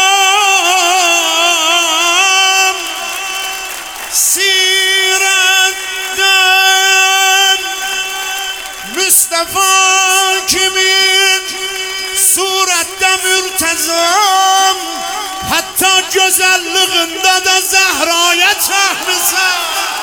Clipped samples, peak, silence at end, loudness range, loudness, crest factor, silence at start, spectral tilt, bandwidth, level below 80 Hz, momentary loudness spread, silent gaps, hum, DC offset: under 0.1%; 0 dBFS; 0 s; 2 LU; -9 LUFS; 12 dB; 0 s; 1.5 dB/octave; over 20 kHz; -50 dBFS; 10 LU; none; none; under 0.1%